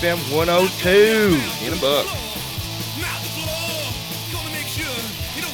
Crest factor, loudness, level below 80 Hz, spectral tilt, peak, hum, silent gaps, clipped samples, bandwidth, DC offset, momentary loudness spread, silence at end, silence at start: 18 dB; -20 LUFS; -40 dBFS; -4 dB/octave; -4 dBFS; none; none; under 0.1%; 19 kHz; under 0.1%; 12 LU; 0 s; 0 s